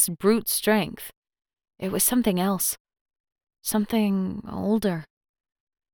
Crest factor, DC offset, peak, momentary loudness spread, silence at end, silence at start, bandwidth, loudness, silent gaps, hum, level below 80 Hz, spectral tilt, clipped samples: 20 dB; under 0.1%; -8 dBFS; 14 LU; 0.9 s; 0 s; over 20 kHz; -24 LUFS; 1.17-1.22 s, 2.80-2.85 s, 3.01-3.05 s, 3.20-3.24 s; none; -56 dBFS; -4 dB/octave; under 0.1%